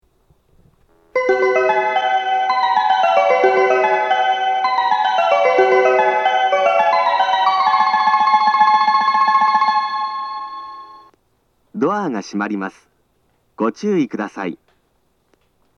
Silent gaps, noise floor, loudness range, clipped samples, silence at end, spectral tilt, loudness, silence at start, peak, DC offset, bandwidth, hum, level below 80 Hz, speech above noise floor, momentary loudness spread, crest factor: none; -63 dBFS; 10 LU; under 0.1%; 1.2 s; -4.5 dB/octave; -16 LUFS; 1.15 s; 0 dBFS; under 0.1%; 7.6 kHz; none; -66 dBFS; 42 dB; 12 LU; 16 dB